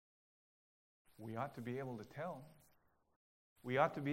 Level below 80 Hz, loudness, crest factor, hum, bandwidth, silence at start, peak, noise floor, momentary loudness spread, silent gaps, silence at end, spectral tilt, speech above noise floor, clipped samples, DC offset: -80 dBFS; -43 LUFS; 26 dB; none; 16 kHz; 1.2 s; -18 dBFS; -75 dBFS; 18 LU; 3.16-3.56 s; 0 s; -7 dB/octave; 34 dB; under 0.1%; under 0.1%